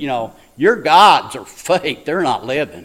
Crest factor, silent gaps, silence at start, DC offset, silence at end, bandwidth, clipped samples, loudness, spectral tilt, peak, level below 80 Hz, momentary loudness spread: 16 dB; none; 0 s; under 0.1%; 0 s; 16.5 kHz; under 0.1%; -14 LUFS; -4 dB/octave; 0 dBFS; -54 dBFS; 17 LU